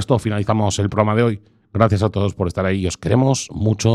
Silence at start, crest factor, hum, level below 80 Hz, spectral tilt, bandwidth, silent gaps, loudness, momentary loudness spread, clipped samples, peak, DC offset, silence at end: 0 s; 18 dB; none; -42 dBFS; -6 dB/octave; 11.5 kHz; none; -19 LUFS; 5 LU; under 0.1%; 0 dBFS; under 0.1%; 0 s